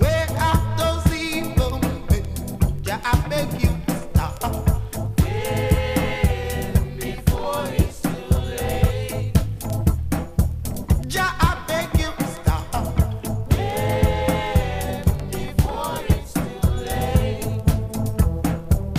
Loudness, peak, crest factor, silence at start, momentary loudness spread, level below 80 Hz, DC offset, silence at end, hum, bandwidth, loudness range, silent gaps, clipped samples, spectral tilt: -23 LUFS; -2 dBFS; 18 dB; 0 s; 5 LU; -26 dBFS; under 0.1%; 0 s; none; 16 kHz; 1 LU; none; under 0.1%; -6 dB/octave